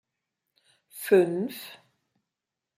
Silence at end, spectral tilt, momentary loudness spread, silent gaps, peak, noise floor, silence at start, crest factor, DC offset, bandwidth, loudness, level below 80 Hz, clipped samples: 1.05 s; -5.5 dB/octave; 23 LU; none; -8 dBFS; -87 dBFS; 0.95 s; 22 dB; under 0.1%; 16 kHz; -25 LUFS; -80 dBFS; under 0.1%